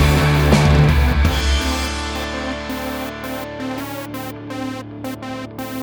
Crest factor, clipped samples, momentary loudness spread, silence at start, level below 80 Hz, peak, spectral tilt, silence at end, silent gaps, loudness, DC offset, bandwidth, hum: 18 dB; under 0.1%; 15 LU; 0 s; -24 dBFS; 0 dBFS; -5.5 dB/octave; 0 s; none; -20 LUFS; under 0.1%; over 20 kHz; none